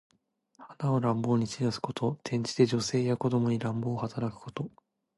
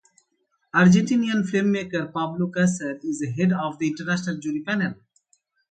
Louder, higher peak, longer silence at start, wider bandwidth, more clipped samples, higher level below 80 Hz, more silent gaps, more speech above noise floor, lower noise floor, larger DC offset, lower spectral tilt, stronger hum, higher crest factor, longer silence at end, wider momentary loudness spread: second, -30 LUFS vs -23 LUFS; second, -10 dBFS vs -6 dBFS; second, 0.6 s vs 0.75 s; first, 11.5 kHz vs 9.2 kHz; neither; about the same, -64 dBFS vs -62 dBFS; neither; second, 38 dB vs 49 dB; second, -67 dBFS vs -72 dBFS; neither; about the same, -6.5 dB/octave vs -6 dB/octave; neither; about the same, 20 dB vs 18 dB; second, 0.5 s vs 0.75 s; about the same, 10 LU vs 11 LU